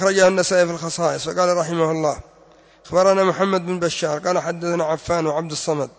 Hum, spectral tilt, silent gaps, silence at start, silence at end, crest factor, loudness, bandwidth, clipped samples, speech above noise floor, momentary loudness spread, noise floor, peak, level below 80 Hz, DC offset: none; -4.5 dB/octave; none; 0 s; 0.1 s; 16 dB; -20 LUFS; 8 kHz; under 0.1%; 31 dB; 7 LU; -50 dBFS; -4 dBFS; -52 dBFS; under 0.1%